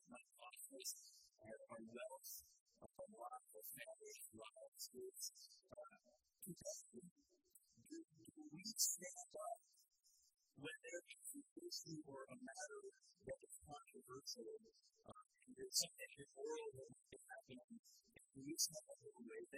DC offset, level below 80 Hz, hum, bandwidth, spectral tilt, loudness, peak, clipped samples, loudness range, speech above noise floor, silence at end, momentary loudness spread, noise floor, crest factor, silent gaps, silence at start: under 0.1%; -88 dBFS; none; 15.5 kHz; -1.5 dB/octave; -52 LUFS; -26 dBFS; under 0.1%; 8 LU; 21 dB; 0 s; 21 LU; -75 dBFS; 30 dB; 2.60-2.66 s, 4.68-4.72 s, 7.11-7.16 s, 11.51-11.56 s, 17.64-17.68 s, 17.79-17.84 s; 0.05 s